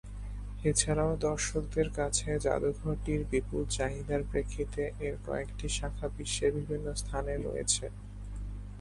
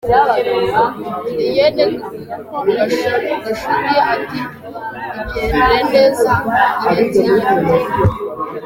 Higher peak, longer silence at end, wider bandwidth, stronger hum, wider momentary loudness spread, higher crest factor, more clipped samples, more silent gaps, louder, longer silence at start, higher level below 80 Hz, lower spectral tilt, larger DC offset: second, -10 dBFS vs 0 dBFS; about the same, 0 s vs 0 s; second, 11.5 kHz vs 17 kHz; first, 50 Hz at -40 dBFS vs none; about the same, 13 LU vs 13 LU; first, 22 dB vs 14 dB; neither; neither; second, -33 LUFS vs -15 LUFS; about the same, 0.05 s vs 0.05 s; about the same, -40 dBFS vs -36 dBFS; second, -4 dB/octave vs -6 dB/octave; neither